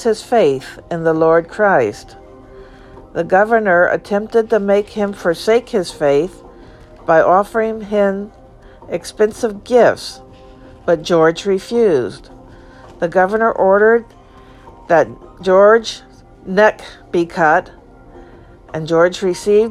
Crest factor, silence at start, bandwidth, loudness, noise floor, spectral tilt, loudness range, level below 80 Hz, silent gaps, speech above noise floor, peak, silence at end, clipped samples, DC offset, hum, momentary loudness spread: 16 dB; 0 s; 13 kHz; -15 LUFS; -41 dBFS; -5.5 dB/octave; 3 LU; -46 dBFS; none; 27 dB; 0 dBFS; 0 s; under 0.1%; under 0.1%; none; 14 LU